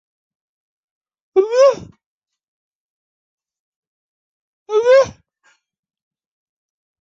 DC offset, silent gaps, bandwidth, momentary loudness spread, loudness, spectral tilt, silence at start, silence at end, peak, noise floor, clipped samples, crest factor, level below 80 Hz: under 0.1%; 2.06-2.22 s, 2.43-3.38 s, 3.60-4.66 s; 7.6 kHz; 10 LU; -15 LUFS; -4 dB/octave; 1.35 s; 1.9 s; -2 dBFS; -60 dBFS; under 0.1%; 18 dB; -60 dBFS